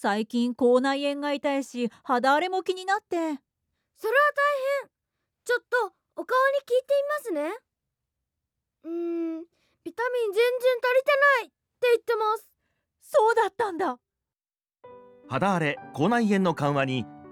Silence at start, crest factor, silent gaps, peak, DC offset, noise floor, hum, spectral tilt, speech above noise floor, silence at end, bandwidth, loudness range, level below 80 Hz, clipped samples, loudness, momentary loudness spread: 0 s; 16 dB; none; -10 dBFS; under 0.1%; under -90 dBFS; none; -5.5 dB/octave; over 65 dB; 0 s; 17 kHz; 5 LU; -76 dBFS; under 0.1%; -25 LUFS; 12 LU